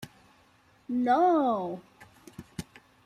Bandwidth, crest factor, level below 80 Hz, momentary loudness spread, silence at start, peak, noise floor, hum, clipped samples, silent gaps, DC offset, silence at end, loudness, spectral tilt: 15 kHz; 18 dB; -64 dBFS; 26 LU; 0 s; -12 dBFS; -62 dBFS; none; under 0.1%; none; under 0.1%; 0.45 s; -26 LUFS; -6.5 dB/octave